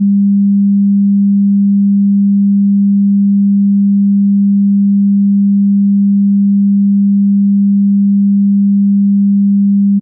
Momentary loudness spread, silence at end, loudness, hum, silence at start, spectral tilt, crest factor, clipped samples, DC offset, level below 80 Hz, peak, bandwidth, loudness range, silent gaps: 0 LU; 0 s; -10 LUFS; none; 0 s; -21.5 dB/octave; 4 dB; under 0.1%; under 0.1%; -78 dBFS; -6 dBFS; 0.3 kHz; 0 LU; none